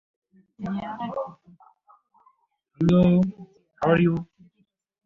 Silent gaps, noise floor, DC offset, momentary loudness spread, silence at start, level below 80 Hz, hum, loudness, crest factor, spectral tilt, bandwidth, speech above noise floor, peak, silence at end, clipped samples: none; -70 dBFS; under 0.1%; 17 LU; 0.6 s; -52 dBFS; none; -23 LUFS; 20 dB; -9.5 dB/octave; 6 kHz; 47 dB; -6 dBFS; 0.8 s; under 0.1%